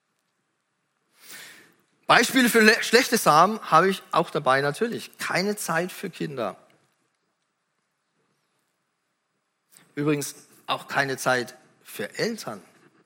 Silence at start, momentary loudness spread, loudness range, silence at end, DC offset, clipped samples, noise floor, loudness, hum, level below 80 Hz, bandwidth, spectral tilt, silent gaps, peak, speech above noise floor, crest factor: 1.3 s; 21 LU; 15 LU; 0.45 s; under 0.1%; under 0.1%; -76 dBFS; -22 LUFS; none; -74 dBFS; 17 kHz; -3.5 dB/octave; none; 0 dBFS; 53 dB; 26 dB